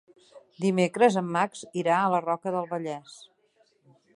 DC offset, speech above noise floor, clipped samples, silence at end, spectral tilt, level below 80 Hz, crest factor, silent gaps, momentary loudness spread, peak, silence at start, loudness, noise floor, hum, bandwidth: under 0.1%; 41 dB; under 0.1%; 1 s; -6 dB/octave; -78 dBFS; 20 dB; none; 11 LU; -8 dBFS; 0.35 s; -26 LUFS; -67 dBFS; none; 11.5 kHz